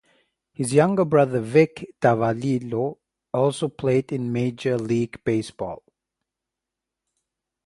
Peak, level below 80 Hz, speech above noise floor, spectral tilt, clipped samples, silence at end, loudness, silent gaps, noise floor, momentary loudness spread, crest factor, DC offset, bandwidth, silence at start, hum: -4 dBFS; -60 dBFS; 64 dB; -7 dB/octave; under 0.1%; 1.9 s; -23 LUFS; none; -86 dBFS; 11 LU; 20 dB; under 0.1%; 11.5 kHz; 0.6 s; none